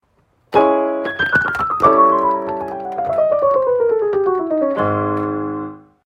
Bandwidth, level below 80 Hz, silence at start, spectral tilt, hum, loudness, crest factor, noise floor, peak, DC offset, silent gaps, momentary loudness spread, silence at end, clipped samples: 9 kHz; -50 dBFS; 0.5 s; -7.5 dB/octave; none; -17 LUFS; 16 dB; -59 dBFS; 0 dBFS; under 0.1%; none; 11 LU; 0.3 s; under 0.1%